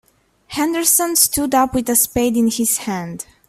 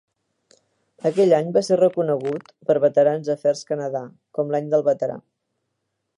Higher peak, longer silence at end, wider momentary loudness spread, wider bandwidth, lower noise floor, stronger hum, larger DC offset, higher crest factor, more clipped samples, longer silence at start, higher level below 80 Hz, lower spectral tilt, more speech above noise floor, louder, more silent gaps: first, 0 dBFS vs -4 dBFS; second, 0.25 s vs 1 s; about the same, 12 LU vs 11 LU; first, 16 kHz vs 11 kHz; second, -46 dBFS vs -77 dBFS; neither; neither; about the same, 18 dB vs 18 dB; neither; second, 0.5 s vs 1.05 s; first, -46 dBFS vs -74 dBFS; second, -2.5 dB/octave vs -6.5 dB/octave; second, 29 dB vs 57 dB; first, -16 LUFS vs -21 LUFS; neither